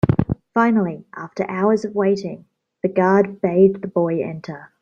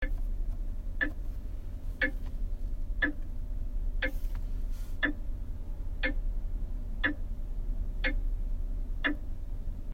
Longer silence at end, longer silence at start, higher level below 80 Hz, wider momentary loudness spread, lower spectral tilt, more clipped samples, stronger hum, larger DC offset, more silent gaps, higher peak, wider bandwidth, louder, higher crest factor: first, 0.15 s vs 0 s; about the same, 0.05 s vs 0 s; second, -48 dBFS vs -32 dBFS; first, 16 LU vs 10 LU; first, -8.5 dB/octave vs -6.5 dB/octave; neither; neither; neither; neither; first, -2 dBFS vs -16 dBFS; first, 7.4 kHz vs 4.7 kHz; first, -19 LUFS vs -37 LUFS; about the same, 18 dB vs 16 dB